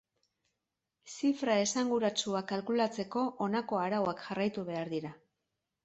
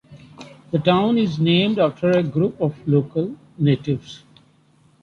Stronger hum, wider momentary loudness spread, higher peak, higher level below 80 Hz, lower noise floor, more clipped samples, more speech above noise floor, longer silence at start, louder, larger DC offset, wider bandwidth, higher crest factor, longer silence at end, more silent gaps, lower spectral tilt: neither; about the same, 8 LU vs 9 LU; second, -16 dBFS vs -2 dBFS; second, -74 dBFS vs -56 dBFS; first, -87 dBFS vs -56 dBFS; neither; first, 55 dB vs 37 dB; first, 1.05 s vs 0.1 s; second, -33 LUFS vs -20 LUFS; neither; first, 8.4 kHz vs 7 kHz; about the same, 18 dB vs 18 dB; second, 0.7 s vs 0.85 s; neither; second, -4 dB/octave vs -8 dB/octave